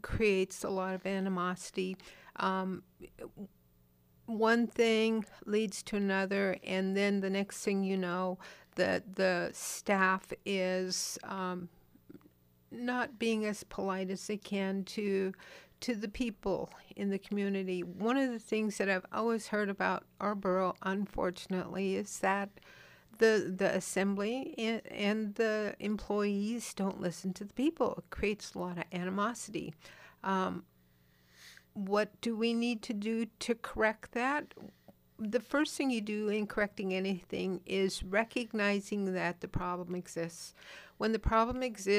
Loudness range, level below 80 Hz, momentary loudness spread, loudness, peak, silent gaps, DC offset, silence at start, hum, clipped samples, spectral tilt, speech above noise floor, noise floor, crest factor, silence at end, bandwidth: 4 LU; -56 dBFS; 10 LU; -34 LUFS; -16 dBFS; none; under 0.1%; 0.05 s; 60 Hz at -65 dBFS; under 0.1%; -5 dB/octave; 33 dB; -67 dBFS; 20 dB; 0 s; 15.5 kHz